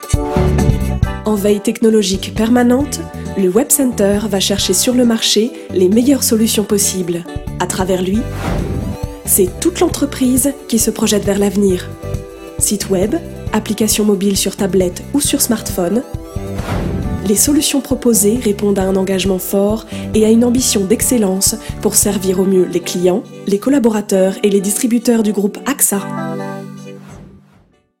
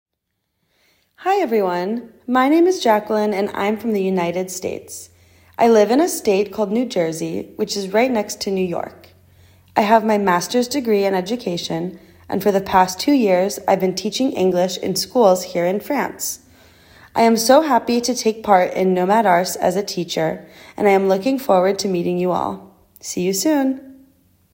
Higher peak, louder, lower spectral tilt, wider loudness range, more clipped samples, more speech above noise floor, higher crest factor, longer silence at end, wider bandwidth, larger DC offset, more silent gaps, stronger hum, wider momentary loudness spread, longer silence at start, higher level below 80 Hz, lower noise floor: about the same, 0 dBFS vs 0 dBFS; first, -14 LUFS vs -18 LUFS; about the same, -4.5 dB/octave vs -4.5 dB/octave; about the same, 3 LU vs 3 LU; neither; second, 37 dB vs 57 dB; about the same, 14 dB vs 18 dB; about the same, 0.65 s vs 0.6 s; about the same, 16.5 kHz vs 16.5 kHz; neither; neither; neither; about the same, 10 LU vs 11 LU; second, 0 s vs 1.2 s; first, -30 dBFS vs -58 dBFS; second, -51 dBFS vs -75 dBFS